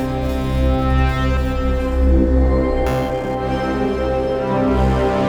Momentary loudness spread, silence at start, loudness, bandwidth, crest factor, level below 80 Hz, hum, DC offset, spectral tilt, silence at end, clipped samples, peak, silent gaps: 5 LU; 0 s; -18 LUFS; 8.4 kHz; 14 dB; -20 dBFS; none; under 0.1%; -8 dB/octave; 0 s; under 0.1%; -4 dBFS; none